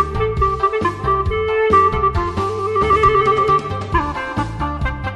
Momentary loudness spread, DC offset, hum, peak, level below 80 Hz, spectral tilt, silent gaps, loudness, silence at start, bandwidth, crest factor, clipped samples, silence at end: 9 LU; under 0.1%; none; -2 dBFS; -28 dBFS; -7 dB/octave; none; -17 LUFS; 0 s; 11.5 kHz; 16 dB; under 0.1%; 0 s